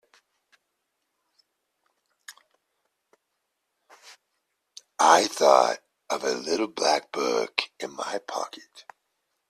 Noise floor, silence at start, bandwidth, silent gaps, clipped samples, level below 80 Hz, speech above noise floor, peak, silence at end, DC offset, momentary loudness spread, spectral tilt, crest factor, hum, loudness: -79 dBFS; 2.3 s; 14 kHz; none; under 0.1%; -76 dBFS; 55 dB; -2 dBFS; 0.7 s; under 0.1%; 16 LU; -1.5 dB/octave; 26 dB; none; -24 LUFS